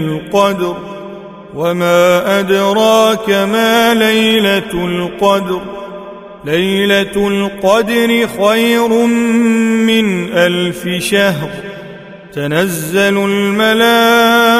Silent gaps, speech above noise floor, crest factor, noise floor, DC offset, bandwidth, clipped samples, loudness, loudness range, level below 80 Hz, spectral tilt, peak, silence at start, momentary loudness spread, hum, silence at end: none; 20 dB; 12 dB; -32 dBFS; under 0.1%; 16 kHz; under 0.1%; -12 LUFS; 4 LU; -46 dBFS; -4.5 dB/octave; 0 dBFS; 0 s; 17 LU; none; 0 s